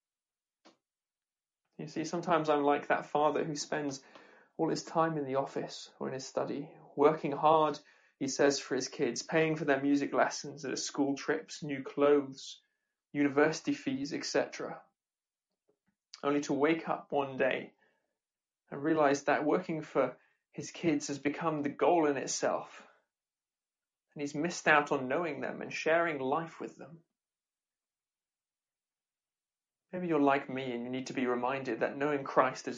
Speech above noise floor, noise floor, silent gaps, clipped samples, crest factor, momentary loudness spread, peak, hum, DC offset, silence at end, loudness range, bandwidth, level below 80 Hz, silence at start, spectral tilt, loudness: over 58 dB; under -90 dBFS; none; under 0.1%; 22 dB; 14 LU; -10 dBFS; none; under 0.1%; 0 s; 5 LU; 9.4 kHz; -80 dBFS; 1.8 s; -4.5 dB/octave; -32 LUFS